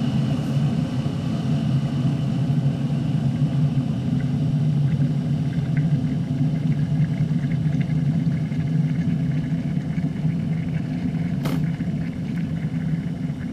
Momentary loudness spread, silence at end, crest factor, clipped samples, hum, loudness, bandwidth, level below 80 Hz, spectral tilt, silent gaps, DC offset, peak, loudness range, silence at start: 4 LU; 0 s; 12 dB; under 0.1%; none; -23 LUFS; 9.4 kHz; -44 dBFS; -8.5 dB/octave; none; under 0.1%; -10 dBFS; 3 LU; 0 s